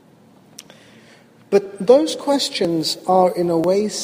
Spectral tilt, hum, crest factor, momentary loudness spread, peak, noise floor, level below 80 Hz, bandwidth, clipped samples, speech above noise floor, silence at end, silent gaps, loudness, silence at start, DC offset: -4.5 dB/octave; none; 18 dB; 5 LU; 0 dBFS; -50 dBFS; -64 dBFS; 15.5 kHz; under 0.1%; 33 dB; 0 s; none; -18 LUFS; 1.5 s; under 0.1%